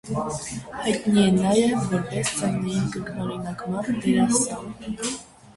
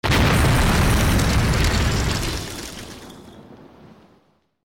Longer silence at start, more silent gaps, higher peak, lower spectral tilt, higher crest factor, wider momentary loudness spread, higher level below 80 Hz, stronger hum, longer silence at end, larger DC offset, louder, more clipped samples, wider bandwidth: about the same, 0.05 s vs 0.05 s; neither; first, -8 dBFS vs -12 dBFS; about the same, -5 dB/octave vs -4.5 dB/octave; first, 16 dB vs 8 dB; second, 12 LU vs 19 LU; second, -52 dBFS vs -26 dBFS; neither; second, 0.05 s vs 1.1 s; neither; second, -24 LUFS vs -19 LUFS; neither; second, 11.5 kHz vs over 20 kHz